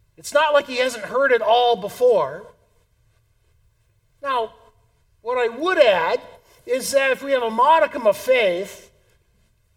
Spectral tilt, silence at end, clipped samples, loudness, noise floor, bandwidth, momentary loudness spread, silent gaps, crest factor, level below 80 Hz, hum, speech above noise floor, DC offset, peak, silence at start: -2.5 dB/octave; 1 s; under 0.1%; -19 LUFS; -62 dBFS; 17.5 kHz; 12 LU; none; 20 dB; -62 dBFS; none; 43 dB; under 0.1%; -2 dBFS; 0.25 s